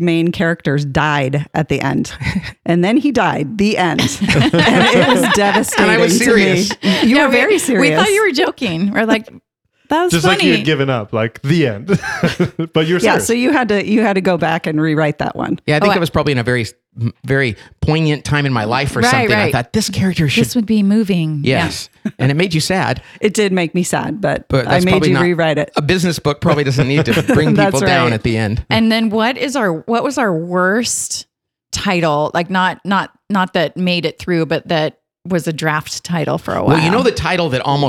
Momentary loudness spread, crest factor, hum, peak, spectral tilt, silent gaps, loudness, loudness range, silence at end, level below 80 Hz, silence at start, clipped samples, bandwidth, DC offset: 7 LU; 12 dB; none; -2 dBFS; -5 dB/octave; none; -14 LUFS; 5 LU; 0 s; -40 dBFS; 0 s; under 0.1%; 16.5 kHz; under 0.1%